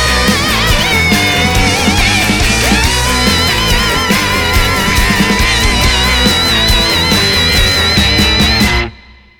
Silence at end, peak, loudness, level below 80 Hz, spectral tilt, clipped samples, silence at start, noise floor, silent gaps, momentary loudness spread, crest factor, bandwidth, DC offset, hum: 0.4 s; 0 dBFS; -9 LUFS; -18 dBFS; -3 dB/octave; under 0.1%; 0 s; -37 dBFS; none; 2 LU; 10 dB; over 20 kHz; under 0.1%; none